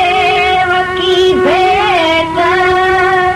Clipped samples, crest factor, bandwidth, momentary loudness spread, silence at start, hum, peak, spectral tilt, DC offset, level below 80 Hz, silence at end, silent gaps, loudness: under 0.1%; 8 dB; 12.5 kHz; 2 LU; 0 s; none; -2 dBFS; -4.5 dB/octave; under 0.1%; -36 dBFS; 0 s; none; -10 LUFS